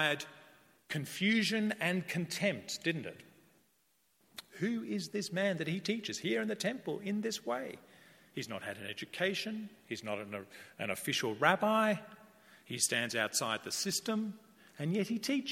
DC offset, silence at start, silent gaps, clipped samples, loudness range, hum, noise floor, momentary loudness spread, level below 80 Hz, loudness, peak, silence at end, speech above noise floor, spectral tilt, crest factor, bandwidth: under 0.1%; 0 s; none; under 0.1%; 6 LU; none; -74 dBFS; 15 LU; -82 dBFS; -35 LUFS; -12 dBFS; 0 s; 39 dB; -3.5 dB/octave; 24 dB; 16.5 kHz